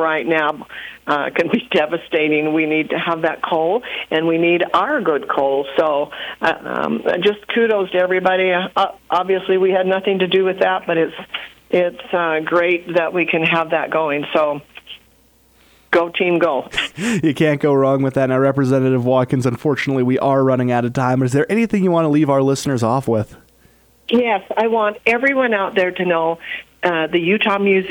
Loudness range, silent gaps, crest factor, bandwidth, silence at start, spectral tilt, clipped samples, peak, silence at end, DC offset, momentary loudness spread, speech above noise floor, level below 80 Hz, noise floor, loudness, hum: 2 LU; none; 16 dB; 19.5 kHz; 0 s; -6 dB/octave; under 0.1%; 0 dBFS; 0 s; under 0.1%; 6 LU; 37 dB; -56 dBFS; -54 dBFS; -17 LUFS; none